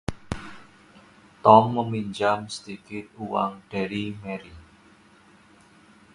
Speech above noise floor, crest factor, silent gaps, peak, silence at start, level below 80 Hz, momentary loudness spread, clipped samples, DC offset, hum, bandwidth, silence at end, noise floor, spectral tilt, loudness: 31 dB; 26 dB; none; 0 dBFS; 0.1 s; -52 dBFS; 21 LU; under 0.1%; under 0.1%; none; 11.5 kHz; 1.55 s; -55 dBFS; -6.5 dB/octave; -24 LUFS